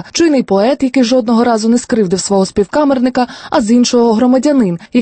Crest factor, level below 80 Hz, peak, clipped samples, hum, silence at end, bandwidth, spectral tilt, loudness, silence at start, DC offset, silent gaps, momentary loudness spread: 10 dB; -46 dBFS; 0 dBFS; under 0.1%; none; 0 s; 8.8 kHz; -5 dB/octave; -12 LUFS; 0.05 s; under 0.1%; none; 4 LU